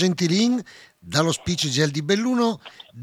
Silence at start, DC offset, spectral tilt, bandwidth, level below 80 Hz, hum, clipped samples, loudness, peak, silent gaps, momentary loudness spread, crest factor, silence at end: 0 s; under 0.1%; -4.5 dB/octave; 15 kHz; -54 dBFS; none; under 0.1%; -22 LUFS; -4 dBFS; none; 7 LU; 18 dB; 0 s